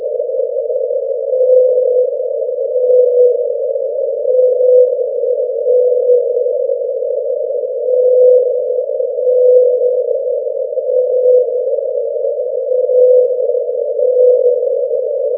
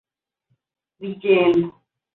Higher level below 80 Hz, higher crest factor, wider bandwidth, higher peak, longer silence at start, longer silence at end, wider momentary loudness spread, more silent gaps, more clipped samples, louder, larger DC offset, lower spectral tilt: second, under -90 dBFS vs -64 dBFS; about the same, 12 dB vs 16 dB; second, 0.8 kHz vs 4.2 kHz; first, 0 dBFS vs -6 dBFS; second, 0 s vs 1 s; second, 0 s vs 0.45 s; second, 8 LU vs 18 LU; neither; neither; first, -13 LUFS vs -18 LUFS; neither; about the same, -9.5 dB/octave vs -8.5 dB/octave